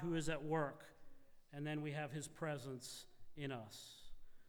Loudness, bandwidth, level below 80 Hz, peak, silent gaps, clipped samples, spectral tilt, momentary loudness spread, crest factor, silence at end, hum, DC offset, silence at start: -46 LUFS; over 20 kHz; -64 dBFS; -28 dBFS; none; under 0.1%; -5.5 dB/octave; 17 LU; 18 dB; 0 s; none; under 0.1%; 0 s